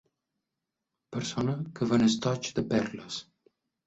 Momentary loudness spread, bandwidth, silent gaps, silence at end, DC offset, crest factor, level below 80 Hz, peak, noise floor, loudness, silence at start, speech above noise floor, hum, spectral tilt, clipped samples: 14 LU; 8 kHz; none; 0.65 s; under 0.1%; 20 dB; -60 dBFS; -12 dBFS; -86 dBFS; -30 LUFS; 1.1 s; 58 dB; none; -5.5 dB/octave; under 0.1%